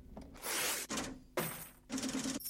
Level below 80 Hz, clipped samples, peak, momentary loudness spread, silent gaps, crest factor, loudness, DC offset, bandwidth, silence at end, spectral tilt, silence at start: -60 dBFS; under 0.1%; -24 dBFS; 10 LU; none; 18 dB; -39 LUFS; under 0.1%; 16.5 kHz; 0 s; -2 dB/octave; 0 s